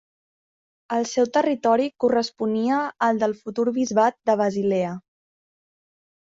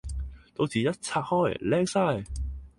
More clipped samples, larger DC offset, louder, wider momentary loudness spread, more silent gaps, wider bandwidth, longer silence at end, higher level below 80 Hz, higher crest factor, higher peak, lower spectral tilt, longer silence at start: neither; neither; first, -22 LUFS vs -28 LUFS; second, 5 LU vs 12 LU; neither; second, 7.8 kHz vs 11.5 kHz; first, 1.2 s vs 0.1 s; second, -68 dBFS vs -40 dBFS; about the same, 16 dB vs 16 dB; first, -6 dBFS vs -12 dBFS; about the same, -5 dB/octave vs -5.5 dB/octave; first, 0.9 s vs 0.05 s